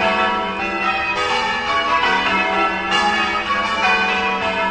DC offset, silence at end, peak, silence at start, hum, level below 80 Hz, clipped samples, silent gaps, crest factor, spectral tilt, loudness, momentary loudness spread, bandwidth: under 0.1%; 0 s; -4 dBFS; 0 s; none; -44 dBFS; under 0.1%; none; 14 dB; -3 dB/octave; -17 LUFS; 3 LU; 9.8 kHz